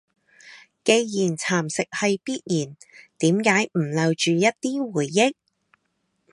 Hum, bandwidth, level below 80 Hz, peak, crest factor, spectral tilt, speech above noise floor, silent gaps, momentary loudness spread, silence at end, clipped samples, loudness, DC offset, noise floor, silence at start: none; 11.5 kHz; -70 dBFS; -2 dBFS; 20 dB; -4.5 dB/octave; 51 dB; none; 7 LU; 1 s; under 0.1%; -22 LUFS; under 0.1%; -73 dBFS; 0.45 s